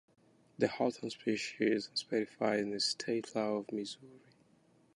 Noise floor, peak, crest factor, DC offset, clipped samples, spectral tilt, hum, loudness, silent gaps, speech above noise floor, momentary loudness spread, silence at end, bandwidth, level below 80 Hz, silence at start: -68 dBFS; -16 dBFS; 22 dB; under 0.1%; under 0.1%; -4 dB/octave; none; -35 LUFS; none; 33 dB; 7 LU; 0.8 s; 11.5 kHz; -78 dBFS; 0.6 s